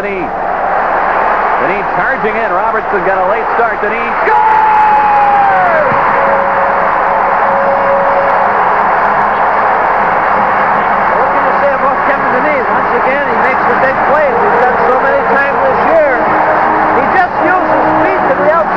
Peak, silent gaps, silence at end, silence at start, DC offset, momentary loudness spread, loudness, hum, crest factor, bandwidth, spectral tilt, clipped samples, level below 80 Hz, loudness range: 0 dBFS; none; 0 s; 0 s; under 0.1%; 4 LU; -10 LUFS; none; 10 dB; 6.8 kHz; -7 dB/octave; under 0.1%; -38 dBFS; 2 LU